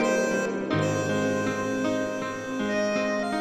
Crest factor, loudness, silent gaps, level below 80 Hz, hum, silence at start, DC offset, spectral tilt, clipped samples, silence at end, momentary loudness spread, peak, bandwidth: 14 dB; -27 LUFS; none; -58 dBFS; none; 0 s; under 0.1%; -5 dB/octave; under 0.1%; 0 s; 5 LU; -12 dBFS; 14.5 kHz